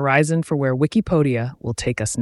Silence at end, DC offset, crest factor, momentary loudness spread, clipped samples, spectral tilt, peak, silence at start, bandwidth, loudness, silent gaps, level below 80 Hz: 0 s; under 0.1%; 16 dB; 7 LU; under 0.1%; -6 dB/octave; -4 dBFS; 0 s; 12 kHz; -20 LUFS; none; -44 dBFS